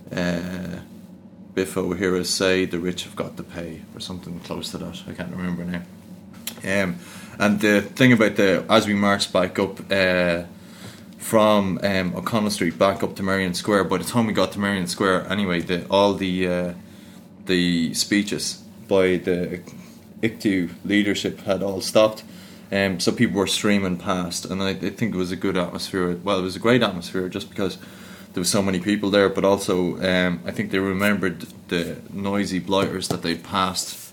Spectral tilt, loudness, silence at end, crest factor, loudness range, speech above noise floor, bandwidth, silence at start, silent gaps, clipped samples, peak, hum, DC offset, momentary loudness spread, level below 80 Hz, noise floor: -4.5 dB/octave; -22 LUFS; 0 s; 22 dB; 5 LU; 22 dB; 18 kHz; 0 s; none; under 0.1%; -2 dBFS; none; under 0.1%; 15 LU; -56 dBFS; -44 dBFS